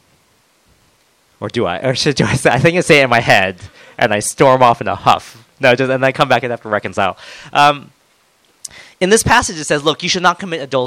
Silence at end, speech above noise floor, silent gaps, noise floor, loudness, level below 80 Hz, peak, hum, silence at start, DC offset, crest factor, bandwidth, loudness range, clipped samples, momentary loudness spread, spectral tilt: 0 s; 42 dB; none; -56 dBFS; -14 LUFS; -44 dBFS; 0 dBFS; none; 1.4 s; under 0.1%; 16 dB; over 20 kHz; 4 LU; 0.5%; 13 LU; -4 dB/octave